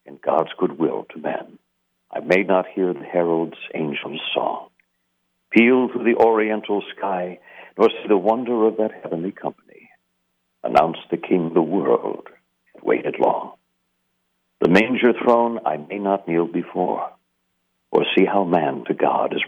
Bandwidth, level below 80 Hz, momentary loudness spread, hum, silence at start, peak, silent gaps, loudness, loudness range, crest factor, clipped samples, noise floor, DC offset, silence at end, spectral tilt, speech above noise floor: 8.2 kHz; -64 dBFS; 12 LU; none; 0.05 s; -4 dBFS; none; -20 LUFS; 3 LU; 18 dB; under 0.1%; -72 dBFS; under 0.1%; 0 s; -7 dB/octave; 52 dB